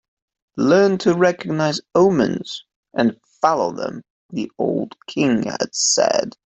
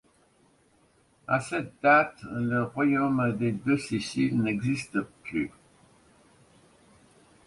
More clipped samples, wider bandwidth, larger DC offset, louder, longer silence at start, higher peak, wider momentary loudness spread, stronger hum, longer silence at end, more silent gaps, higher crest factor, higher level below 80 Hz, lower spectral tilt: neither; second, 8.2 kHz vs 11.5 kHz; neither; first, -19 LUFS vs -27 LUFS; second, 0.55 s vs 1.3 s; first, -2 dBFS vs -8 dBFS; first, 14 LU vs 11 LU; neither; second, 0.2 s vs 2 s; first, 2.76-2.83 s, 4.10-4.29 s vs none; second, 16 dB vs 22 dB; about the same, -60 dBFS vs -62 dBFS; second, -4 dB/octave vs -6.5 dB/octave